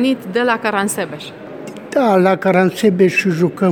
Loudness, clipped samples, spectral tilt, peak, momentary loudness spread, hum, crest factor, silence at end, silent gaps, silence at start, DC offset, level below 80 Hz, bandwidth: -15 LUFS; under 0.1%; -5.5 dB/octave; 0 dBFS; 18 LU; none; 14 dB; 0 s; none; 0 s; under 0.1%; -60 dBFS; 19.5 kHz